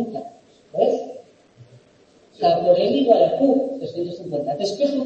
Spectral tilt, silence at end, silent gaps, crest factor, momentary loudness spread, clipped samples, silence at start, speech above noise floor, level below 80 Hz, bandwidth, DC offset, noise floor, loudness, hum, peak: -6.5 dB/octave; 0 s; none; 18 dB; 14 LU; under 0.1%; 0 s; 35 dB; -66 dBFS; 8.6 kHz; under 0.1%; -54 dBFS; -20 LUFS; none; -2 dBFS